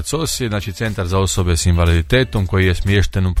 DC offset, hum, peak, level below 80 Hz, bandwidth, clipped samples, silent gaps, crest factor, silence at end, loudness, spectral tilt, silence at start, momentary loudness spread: under 0.1%; none; -2 dBFS; -26 dBFS; 15 kHz; under 0.1%; none; 14 dB; 0 s; -17 LUFS; -5 dB/octave; 0 s; 7 LU